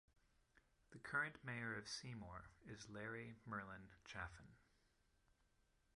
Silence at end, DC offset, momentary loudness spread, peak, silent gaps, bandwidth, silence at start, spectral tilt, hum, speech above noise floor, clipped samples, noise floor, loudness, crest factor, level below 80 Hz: 1.35 s; under 0.1%; 15 LU; -32 dBFS; none; 11 kHz; 0.55 s; -4 dB/octave; none; 29 dB; under 0.1%; -81 dBFS; -51 LUFS; 22 dB; -72 dBFS